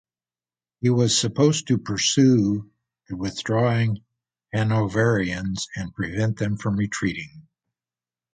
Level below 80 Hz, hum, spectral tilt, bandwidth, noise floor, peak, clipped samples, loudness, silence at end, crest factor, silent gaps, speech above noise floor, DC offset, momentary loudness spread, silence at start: -50 dBFS; none; -5 dB/octave; 9.6 kHz; under -90 dBFS; -6 dBFS; under 0.1%; -23 LUFS; 0.95 s; 18 dB; none; over 68 dB; under 0.1%; 12 LU; 0.8 s